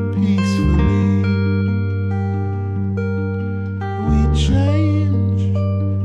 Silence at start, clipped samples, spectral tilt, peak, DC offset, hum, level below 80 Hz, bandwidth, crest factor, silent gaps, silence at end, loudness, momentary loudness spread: 0 s; under 0.1%; -8 dB/octave; -4 dBFS; under 0.1%; none; -26 dBFS; 8.4 kHz; 12 dB; none; 0 s; -18 LUFS; 6 LU